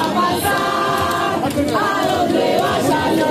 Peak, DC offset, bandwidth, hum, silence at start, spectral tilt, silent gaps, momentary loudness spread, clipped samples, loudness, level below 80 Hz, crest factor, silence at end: -4 dBFS; under 0.1%; 15 kHz; none; 0 s; -4.5 dB/octave; none; 2 LU; under 0.1%; -17 LUFS; -46 dBFS; 12 dB; 0 s